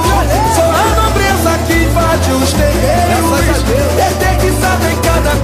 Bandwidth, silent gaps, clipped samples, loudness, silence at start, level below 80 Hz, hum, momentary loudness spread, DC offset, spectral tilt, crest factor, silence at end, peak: 15.5 kHz; none; under 0.1%; -11 LUFS; 0 s; -18 dBFS; none; 2 LU; under 0.1%; -5 dB/octave; 10 dB; 0 s; 0 dBFS